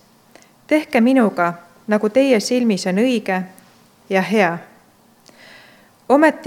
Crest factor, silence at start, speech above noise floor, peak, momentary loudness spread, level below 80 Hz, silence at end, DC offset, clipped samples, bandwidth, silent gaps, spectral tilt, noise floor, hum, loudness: 18 dB; 0.7 s; 36 dB; 0 dBFS; 9 LU; -70 dBFS; 0 s; under 0.1%; under 0.1%; 16 kHz; none; -5.5 dB/octave; -52 dBFS; none; -17 LUFS